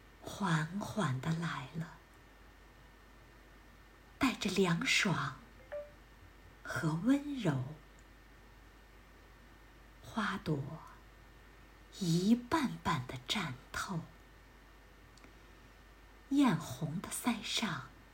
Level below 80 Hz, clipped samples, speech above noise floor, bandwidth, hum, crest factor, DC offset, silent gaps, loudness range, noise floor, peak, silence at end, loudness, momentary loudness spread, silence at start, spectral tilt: -60 dBFS; under 0.1%; 24 dB; 16 kHz; none; 20 dB; under 0.1%; none; 8 LU; -59 dBFS; -18 dBFS; 0.05 s; -35 LUFS; 18 LU; 0.05 s; -5 dB/octave